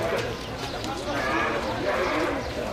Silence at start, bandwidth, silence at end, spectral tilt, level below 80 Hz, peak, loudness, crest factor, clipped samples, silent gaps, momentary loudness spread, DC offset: 0 s; 16 kHz; 0 s; -4.5 dB/octave; -44 dBFS; -14 dBFS; -27 LUFS; 14 dB; under 0.1%; none; 7 LU; under 0.1%